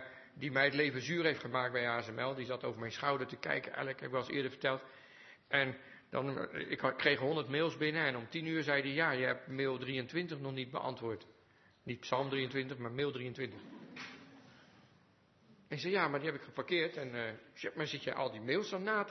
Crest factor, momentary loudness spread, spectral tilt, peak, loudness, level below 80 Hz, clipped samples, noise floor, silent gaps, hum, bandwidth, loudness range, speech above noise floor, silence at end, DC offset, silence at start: 24 dB; 12 LU; -3 dB/octave; -14 dBFS; -37 LUFS; -80 dBFS; under 0.1%; -68 dBFS; none; none; 6.2 kHz; 6 LU; 31 dB; 0 s; under 0.1%; 0 s